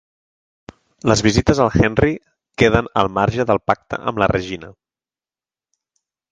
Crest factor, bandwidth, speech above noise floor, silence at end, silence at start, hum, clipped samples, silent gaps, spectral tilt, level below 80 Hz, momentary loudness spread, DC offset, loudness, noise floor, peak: 20 dB; 9.6 kHz; over 73 dB; 1.6 s; 1.05 s; none; under 0.1%; none; -5.5 dB/octave; -36 dBFS; 10 LU; under 0.1%; -17 LUFS; under -90 dBFS; 0 dBFS